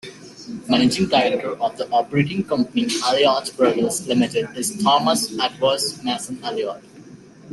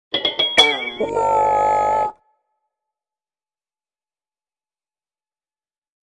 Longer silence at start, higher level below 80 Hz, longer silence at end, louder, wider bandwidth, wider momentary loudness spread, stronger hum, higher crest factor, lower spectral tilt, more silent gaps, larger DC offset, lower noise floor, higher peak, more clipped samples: about the same, 0.05 s vs 0.1 s; about the same, -58 dBFS vs -54 dBFS; second, 0 s vs 4.05 s; second, -20 LUFS vs -17 LUFS; about the same, 12.5 kHz vs 11.5 kHz; about the same, 10 LU vs 10 LU; neither; about the same, 18 dB vs 22 dB; first, -4 dB/octave vs -2 dB/octave; neither; neither; second, -43 dBFS vs under -90 dBFS; second, -4 dBFS vs 0 dBFS; neither